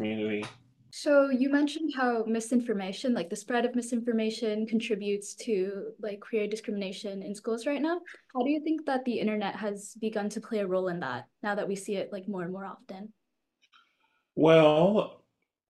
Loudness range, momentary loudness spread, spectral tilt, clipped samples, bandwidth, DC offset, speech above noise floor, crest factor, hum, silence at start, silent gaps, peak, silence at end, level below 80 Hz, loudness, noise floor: 6 LU; 13 LU; -5.5 dB/octave; under 0.1%; 12.5 kHz; under 0.1%; 45 dB; 22 dB; none; 0 s; none; -8 dBFS; 0.55 s; -76 dBFS; -29 LUFS; -74 dBFS